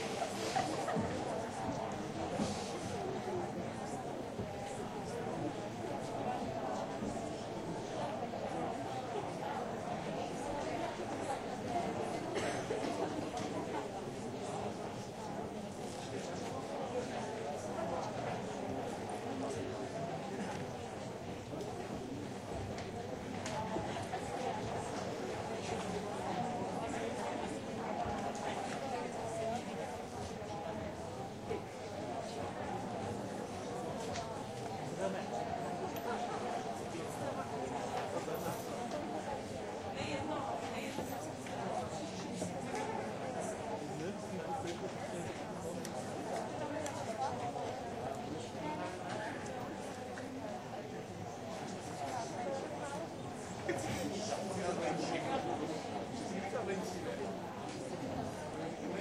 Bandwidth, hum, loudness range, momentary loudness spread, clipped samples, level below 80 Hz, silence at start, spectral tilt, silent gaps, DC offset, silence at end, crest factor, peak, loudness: 16 kHz; none; 3 LU; 5 LU; under 0.1%; -64 dBFS; 0 s; -5 dB/octave; none; under 0.1%; 0 s; 18 dB; -22 dBFS; -41 LUFS